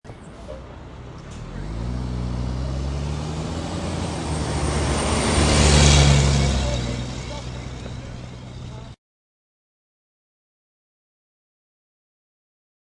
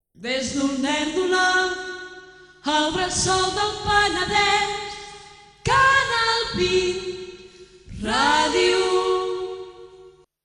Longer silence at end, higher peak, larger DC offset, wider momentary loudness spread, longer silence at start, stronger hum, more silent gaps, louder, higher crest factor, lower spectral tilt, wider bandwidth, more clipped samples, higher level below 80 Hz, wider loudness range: first, 4 s vs 0.35 s; first, -2 dBFS vs -6 dBFS; neither; first, 23 LU vs 16 LU; second, 0.05 s vs 0.2 s; neither; neither; about the same, -21 LUFS vs -21 LUFS; first, 22 dB vs 16 dB; first, -4.5 dB/octave vs -2.5 dB/octave; about the same, 11.5 kHz vs 10.5 kHz; neither; first, -30 dBFS vs -46 dBFS; first, 19 LU vs 3 LU